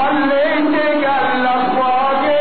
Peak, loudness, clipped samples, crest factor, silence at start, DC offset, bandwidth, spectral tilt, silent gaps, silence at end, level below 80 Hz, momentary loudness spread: -6 dBFS; -15 LUFS; under 0.1%; 10 dB; 0 s; 4%; 4.6 kHz; -1.5 dB/octave; none; 0 s; -54 dBFS; 1 LU